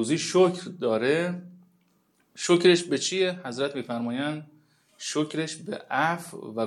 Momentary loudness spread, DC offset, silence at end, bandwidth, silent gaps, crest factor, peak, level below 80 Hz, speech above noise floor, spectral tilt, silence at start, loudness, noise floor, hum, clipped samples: 13 LU; under 0.1%; 0 s; 12.5 kHz; none; 20 dB; -8 dBFS; -80 dBFS; 42 dB; -4.5 dB/octave; 0 s; -26 LUFS; -67 dBFS; none; under 0.1%